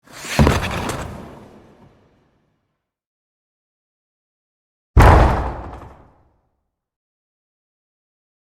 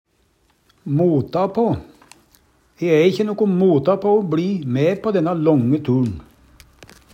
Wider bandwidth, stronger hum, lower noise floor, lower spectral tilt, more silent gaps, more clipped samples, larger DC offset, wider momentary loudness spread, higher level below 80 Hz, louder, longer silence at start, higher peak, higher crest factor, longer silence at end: about the same, 16 kHz vs 15.5 kHz; neither; first, -75 dBFS vs -61 dBFS; second, -6 dB/octave vs -8.5 dB/octave; first, 3.06-4.94 s vs none; neither; neither; first, 25 LU vs 8 LU; first, -26 dBFS vs -54 dBFS; about the same, -16 LUFS vs -18 LUFS; second, 0.15 s vs 0.85 s; about the same, 0 dBFS vs -2 dBFS; about the same, 20 dB vs 16 dB; first, 2.6 s vs 0.3 s